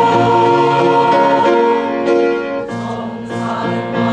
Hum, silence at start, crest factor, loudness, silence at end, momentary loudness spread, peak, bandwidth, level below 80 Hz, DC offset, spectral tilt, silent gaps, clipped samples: none; 0 s; 12 dB; -14 LUFS; 0 s; 11 LU; -2 dBFS; 9.6 kHz; -52 dBFS; under 0.1%; -6.5 dB/octave; none; under 0.1%